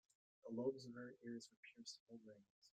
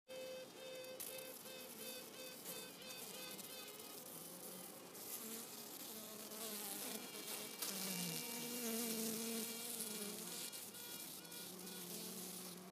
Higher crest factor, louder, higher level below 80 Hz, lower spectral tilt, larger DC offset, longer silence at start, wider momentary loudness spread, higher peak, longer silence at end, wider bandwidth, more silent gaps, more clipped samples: about the same, 22 dB vs 24 dB; second, -52 LUFS vs -47 LUFS; about the same, under -90 dBFS vs under -90 dBFS; first, -5 dB/octave vs -2 dB/octave; neither; first, 0.45 s vs 0.1 s; first, 17 LU vs 9 LU; second, -32 dBFS vs -24 dBFS; about the same, 0.1 s vs 0 s; second, 9.4 kHz vs 15.5 kHz; first, 1.57-1.63 s, 2.00-2.07 s, 2.50-2.62 s vs none; neither